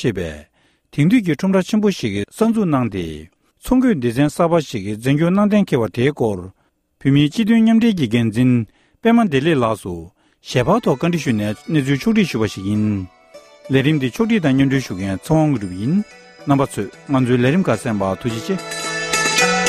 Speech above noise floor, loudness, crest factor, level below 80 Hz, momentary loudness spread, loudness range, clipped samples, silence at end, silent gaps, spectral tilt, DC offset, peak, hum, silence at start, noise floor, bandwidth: 27 dB; -18 LUFS; 16 dB; -46 dBFS; 10 LU; 3 LU; under 0.1%; 0 s; none; -6 dB/octave; under 0.1%; -2 dBFS; none; 0 s; -43 dBFS; 15 kHz